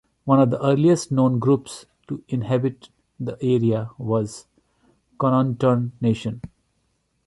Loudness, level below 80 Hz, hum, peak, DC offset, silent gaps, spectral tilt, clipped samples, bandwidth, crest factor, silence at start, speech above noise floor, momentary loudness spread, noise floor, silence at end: -21 LUFS; -56 dBFS; none; -6 dBFS; under 0.1%; none; -7.5 dB/octave; under 0.1%; 11.5 kHz; 16 dB; 0.25 s; 49 dB; 16 LU; -69 dBFS; 0.8 s